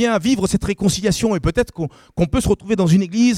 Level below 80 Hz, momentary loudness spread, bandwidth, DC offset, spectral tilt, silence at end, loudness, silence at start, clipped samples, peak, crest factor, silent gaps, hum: -34 dBFS; 7 LU; 15.5 kHz; under 0.1%; -5.5 dB/octave; 0 s; -18 LUFS; 0 s; under 0.1%; -4 dBFS; 14 dB; none; none